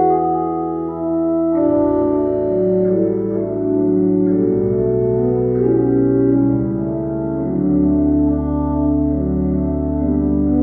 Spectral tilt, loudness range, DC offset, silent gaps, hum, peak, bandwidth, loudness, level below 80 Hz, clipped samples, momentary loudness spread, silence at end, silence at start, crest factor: -14 dB/octave; 1 LU; under 0.1%; none; none; -4 dBFS; 2.3 kHz; -17 LUFS; -32 dBFS; under 0.1%; 5 LU; 0 s; 0 s; 12 dB